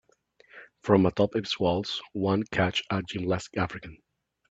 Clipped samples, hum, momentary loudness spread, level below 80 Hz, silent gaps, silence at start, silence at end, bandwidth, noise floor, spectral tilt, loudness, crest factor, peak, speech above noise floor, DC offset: under 0.1%; none; 10 LU; -58 dBFS; none; 0.55 s; 0.55 s; 8 kHz; -62 dBFS; -6 dB/octave; -27 LUFS; 22 dB; -6 dBFS; 35 dB; under 0.1%